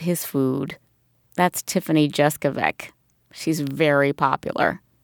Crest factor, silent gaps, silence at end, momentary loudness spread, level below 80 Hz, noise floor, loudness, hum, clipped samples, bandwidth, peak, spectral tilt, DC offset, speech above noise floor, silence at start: 20 dB; none; 0.25 s; 14 LU; -60 dBFS; -62 dBFS; -22 LUFS; none; under 0.1%; over 20 kHz; -4 dBFS; -5 dB/octave; under 0.1%; 40 dB; 0 s